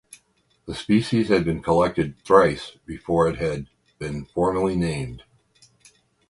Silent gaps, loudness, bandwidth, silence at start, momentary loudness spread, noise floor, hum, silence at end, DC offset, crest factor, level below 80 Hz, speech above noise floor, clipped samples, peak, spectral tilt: none; -22 LUFS; 11.5 kHz; 0.65 s; 17 LU; -65 dBFS; none; 1.1 s; under 0.1%; 22 dB; -46 dBFS; 43 dB; under 0.1%; 0 dBFS; -6.5 dB/octave